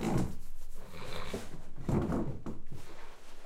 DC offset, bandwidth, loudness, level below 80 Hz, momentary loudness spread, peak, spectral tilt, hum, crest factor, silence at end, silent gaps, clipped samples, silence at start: under 0.1%; 13 kHz; -38 LUFS; -42 dBFS; 18 LU; -18 dBFS; -6.5 dB/octave; none; 14 dB; 0 s; none; under 0.1%; 0 s